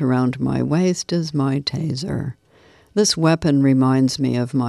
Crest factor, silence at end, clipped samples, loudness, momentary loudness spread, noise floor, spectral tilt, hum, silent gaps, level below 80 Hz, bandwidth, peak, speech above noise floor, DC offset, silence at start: 14 dB; 0 s; under 0.1%; -19 LUFS; 9 LU; -52 dBFS; -5.5 dB/octave; none; none; -50 dBFS; 12.5 kHz; -6 dBFS; 34 dB; under 0.1%; 0 s